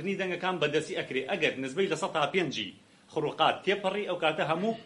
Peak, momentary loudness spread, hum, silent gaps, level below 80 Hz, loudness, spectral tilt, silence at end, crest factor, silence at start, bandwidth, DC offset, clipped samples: -10 dBFS; 7 LU; none; none; -74 dBFS; -30 LUFS; -4.5 dB/octave; 0 s; 20 dB; 0 s; 11.5 kHz; under 0.1%; under 0.1%